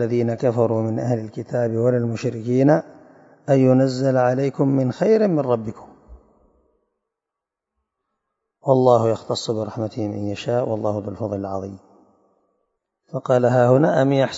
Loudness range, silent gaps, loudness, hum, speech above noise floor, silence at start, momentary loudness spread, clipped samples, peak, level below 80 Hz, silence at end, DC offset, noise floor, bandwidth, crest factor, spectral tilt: 8 LU; none; -20 LUFS; none; 66 dB; 0 s; 11 LU; under 0.1%; -2 dBFS; -60 dBFS; 0 s; under 0.1%; -85 dBFS; 8 kHz; 20 dB; -7.5 dB/octave